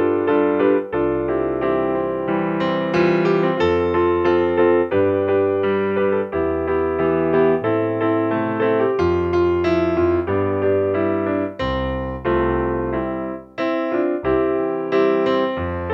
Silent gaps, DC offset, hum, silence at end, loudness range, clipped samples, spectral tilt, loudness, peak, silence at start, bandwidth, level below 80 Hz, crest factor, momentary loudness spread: none; under 0.1%; none; 0 s; 4 LU; under 0.1%; -8.5 dB/octave; -19 LUFS; -4 dBFS; 0 s; 6.4 kHz; -40 dBFS; 14 dB; 5 LU